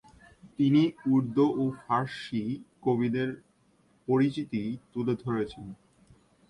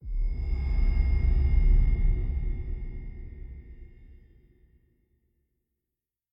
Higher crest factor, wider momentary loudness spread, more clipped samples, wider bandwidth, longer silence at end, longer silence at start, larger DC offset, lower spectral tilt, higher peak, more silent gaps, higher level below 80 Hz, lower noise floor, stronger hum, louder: about the same, 18 dB vs 16 dB; second, 12 LU vs 19 LU; neither; first, 11 kHz vs 5.2 kHz; second, 0.75 s vs 2.25 s; first, 0.45 s vs 0.05 s; neither; second, -8 dB/octave vs -10 dB/octave; about the same, -12 dBFS vs -12 dBFS; neither; second, -64 dBFS vs -28 dBFS; second, -66 dBFS vs -88 dBFS; neither; about the same, -29 LUFS vs -29 LUFS